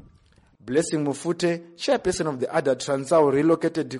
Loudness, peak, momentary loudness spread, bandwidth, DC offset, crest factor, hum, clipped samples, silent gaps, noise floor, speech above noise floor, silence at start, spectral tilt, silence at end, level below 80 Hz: -23 LUFS; -8 dBFS; 7 LU; 11.5 kHz; under 0.1%; 16 dB; none; under 0.1%; none; -57 dBFS; 35 dB; 0.65 s; -5 dB/octave; 0 s; -56 dBFS